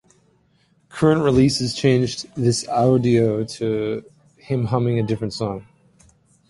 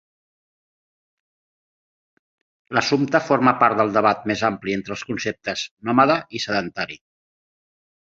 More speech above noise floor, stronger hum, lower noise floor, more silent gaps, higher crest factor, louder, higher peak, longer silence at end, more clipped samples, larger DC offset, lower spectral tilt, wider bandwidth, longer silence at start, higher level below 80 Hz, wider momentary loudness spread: second, 42 dB vs over 70 dB; neither; second, -61 dBFS vs under -90 dBFS; second, none vs 5.71-5.77 s; about the same, 18 dB vs 22 dB; about the same, -20 LUFS vs -21 LUFS; about the same, -4 dBFS vs -2 dBFS; second, 0.85 s vs 1.15 s; neither; neither; about the same, -6 dB/octave vs -5 dB/octave; first, 11.5 kHz vs 7.8 kHz; second, 0.95 s vs 2.7 s; first, -48 dBFS vs -60 dBFS; about the same, 11 LU vs 11 LU